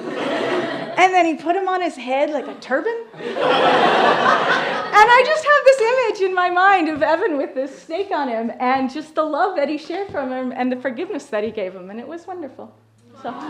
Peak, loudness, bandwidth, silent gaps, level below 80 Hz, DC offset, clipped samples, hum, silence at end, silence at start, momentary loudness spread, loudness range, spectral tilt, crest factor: 0 dBFS; -18 LUFS; 11.5 kHz; none; -64 dBFS; under 0.1%; under 0.1%; none; 0 s; 0 s; 15 LU; 9 LU; -4 dB/octave; 18 dB